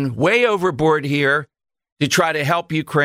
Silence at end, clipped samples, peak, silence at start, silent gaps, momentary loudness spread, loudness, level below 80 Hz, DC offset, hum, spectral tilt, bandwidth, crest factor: 0 s; under 0.1%; -4 dBFS; 0 s; 1.92-1.97 s; 5 LU; -18 LUFS; -54 dBFS; under 0.1%; none; -5 dB/octave; 16 kHz; 14 dB